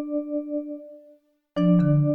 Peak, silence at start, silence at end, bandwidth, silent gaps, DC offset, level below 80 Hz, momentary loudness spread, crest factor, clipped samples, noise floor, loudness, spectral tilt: -10 dBFS; 0 s; 0 s; 4.9 kHz; none; under 0.1%; -56 dBFS; 17 LU; 14 dB; under 0.1%; -57 dBFS; -24 LUFS; -11 dB/octave